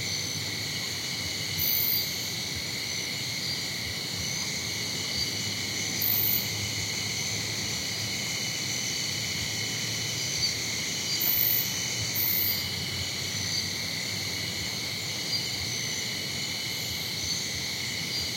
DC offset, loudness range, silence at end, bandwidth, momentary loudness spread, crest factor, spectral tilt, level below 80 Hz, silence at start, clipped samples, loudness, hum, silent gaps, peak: under 0.1%; 3 LU; 0 s; 16.5 kHz; 6 LU; 20 dB; -1.5 dB/octave; -60 dBFS; 0 s; under 0.1%; -28 LUFS; none; none; -10 dBFS